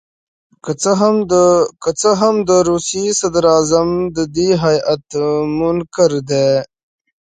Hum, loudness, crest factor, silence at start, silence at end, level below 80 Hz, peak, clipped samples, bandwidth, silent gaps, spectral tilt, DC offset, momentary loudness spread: none; -14 LUFS; 14 dB; 0.65 s; 0.75 s; -48 dBFS; 0 dBFS; under 0.1%; 9.6 kHz; none; -5 dB/octave; under 0.1%; 6 LU